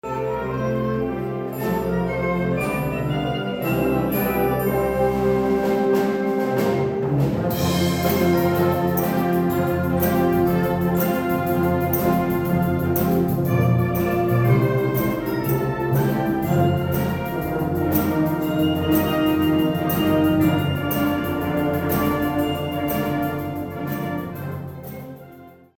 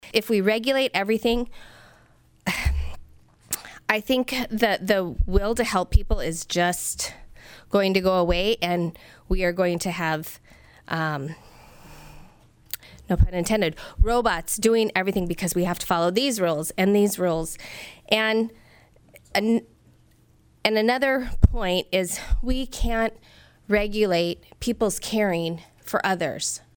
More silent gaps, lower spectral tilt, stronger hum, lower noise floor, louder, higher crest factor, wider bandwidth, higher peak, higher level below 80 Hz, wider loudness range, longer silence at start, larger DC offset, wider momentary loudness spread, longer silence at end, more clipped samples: neither; first, -7 dB/octave vs -4.5 dB/octave; neither; second, -44 dBFS vs -58 dBFS; first, -21 LUFS vs -24 LUFS; second, 16 dB vs 22 dB; about the same, 19.5 kHz vs over 20 kHz; about the same, -6 dBFS vs -4 dBFS; second, -42 dBFS vs -32 dBFS; about the same, 4 LU vs 5 LU; about the same, 0.05 s vs 0.05 s; neither; second, 6 LU vs 10 LU; about the same, 0.3 s vs 0.2 s; neither